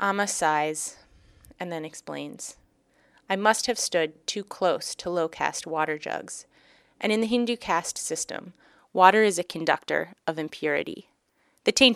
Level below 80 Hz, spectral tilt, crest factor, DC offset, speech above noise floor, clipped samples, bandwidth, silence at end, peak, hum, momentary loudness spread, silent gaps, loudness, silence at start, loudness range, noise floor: -64 dBFS; -2.5 dB/octave; 24 dB; under 0.1%; 42 dB; under 0.1%; 15.5 kHz; 0 s; -2 dBFS; none; 14 LU; none; -26 LUFS; 0 s; 5 LU; -68 dBFS